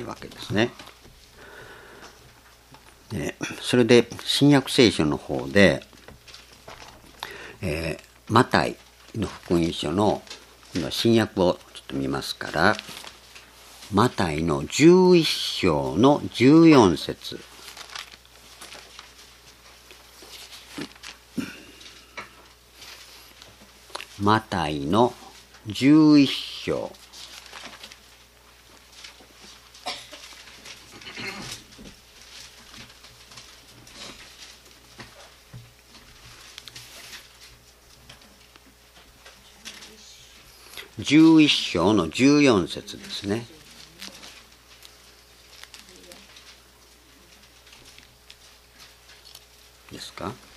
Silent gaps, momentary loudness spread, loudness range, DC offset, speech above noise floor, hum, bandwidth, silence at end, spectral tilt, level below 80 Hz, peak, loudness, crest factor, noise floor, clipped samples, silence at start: none; 27 LU; 24 LU; under 0.1%; 33 dB; none; 14.5 kHz; 0.25 s; -5.5 dB/octave; -54 dBFS; 0 dBFS; -21 LUFS; 26 dB; -53 dBFS; under 0.1%; 0 s